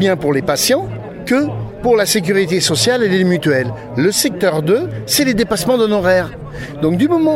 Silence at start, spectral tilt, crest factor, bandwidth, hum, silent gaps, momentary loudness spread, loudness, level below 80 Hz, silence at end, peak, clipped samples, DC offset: 0 s; -4.5 dB/octave; 14 dB; 16.5 kHz; none; none; 7 LU; -15 LUFS; -42 dBFS; 0 s; 0 dBFS; under 0.1%; under 0.1%